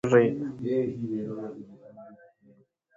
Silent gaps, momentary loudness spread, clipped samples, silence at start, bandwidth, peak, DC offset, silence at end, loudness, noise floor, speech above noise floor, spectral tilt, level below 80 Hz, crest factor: none; 27 LU; under 0.1%; 0.05 s; 7.6 kHz; -8 dBFS; under 0.1%; 0.8 s; -28 LUFS; -61 dBFS; 35 dB; -8 dB/octave; -68 dBFS; 22 dB